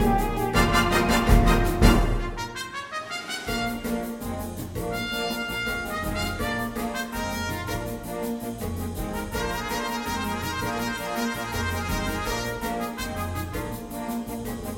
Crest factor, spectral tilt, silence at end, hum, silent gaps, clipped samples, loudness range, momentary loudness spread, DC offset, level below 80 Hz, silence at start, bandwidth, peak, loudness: 24 dB; -5 dB/octave; 0 s; none; none; under 0.1%; 7 LU; 12 LU; under 0.1%; -32 dBFS; 0 s; 17 kHz; -2 dBFS; -27 LUFS